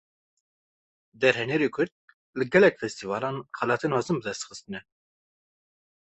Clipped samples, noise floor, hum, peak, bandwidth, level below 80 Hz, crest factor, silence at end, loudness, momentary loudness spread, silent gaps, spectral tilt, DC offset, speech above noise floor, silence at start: under 0.1%; under -90 dBFS; none; -6 dBFS; 8.4 kHz; -68 dBFS; 24 dB; 1.35 s; -26 LUFS; 17 LU; 1.92-2.08 s, 2.14-2.33 s; -5 dB/octave; under 0.1%; over 64 dB; 1.2 s